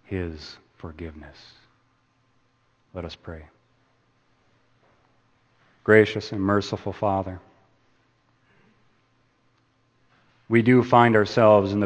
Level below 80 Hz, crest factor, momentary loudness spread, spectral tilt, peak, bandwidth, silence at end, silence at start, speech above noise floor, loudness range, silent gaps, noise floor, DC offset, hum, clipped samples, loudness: -56 dBFS; 24 dB; 25 LU; -7.5 dB/octave; 0 dBFS; 8.6 kHz; 0 s; 0.1 s; 45 dB; 21 LU; none; -66 dBFS; under 0.1%; none; under 0.1%; -20 LUFS